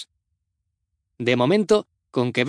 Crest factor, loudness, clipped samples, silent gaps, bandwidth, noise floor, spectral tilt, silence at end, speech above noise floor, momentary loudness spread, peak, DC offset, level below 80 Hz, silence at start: 18 dB; -21 LUFS; under 0.1%; none; 10.5 kHz; -78 dBFS; -6 dB/octave; 0 s; 58 dB; 11 LU; -6 dBFS; under 0.1%; -66 dBFS; 0 s